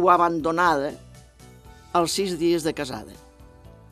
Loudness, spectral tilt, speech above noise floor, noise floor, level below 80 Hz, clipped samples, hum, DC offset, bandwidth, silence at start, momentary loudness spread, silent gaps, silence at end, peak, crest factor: -23 LUFS; -4.5 dB/octave; 26 dB; -48 dBFS; -52 dBFS; under 0.1%; none; under 0.1%; 14.5 kHz; 0 s; 16 LU; none; 0.5 s; -4 dBFS; 20 dB